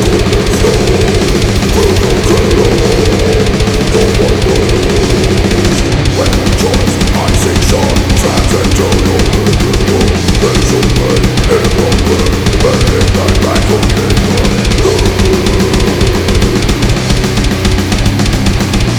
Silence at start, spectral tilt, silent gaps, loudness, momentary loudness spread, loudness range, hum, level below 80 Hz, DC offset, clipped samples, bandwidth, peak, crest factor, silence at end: 0 s; -5 dB/octave; none; -10 LUFS; 2 LU; 1 LU; none; -16 dBFS; 1%; 0.5%; over 20 kHz; 0 dBFS; 8 dB; 0 s